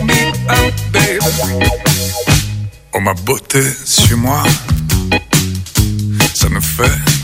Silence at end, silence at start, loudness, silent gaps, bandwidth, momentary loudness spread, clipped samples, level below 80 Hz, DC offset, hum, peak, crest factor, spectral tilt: 0 s; 0 s; -13 LUFS; none; 16.5 kHz; 5 LU; under 0.1%; -24 dBFS; under 0.1%; none; 0 dBFS; 14 dB; -4 dB/octave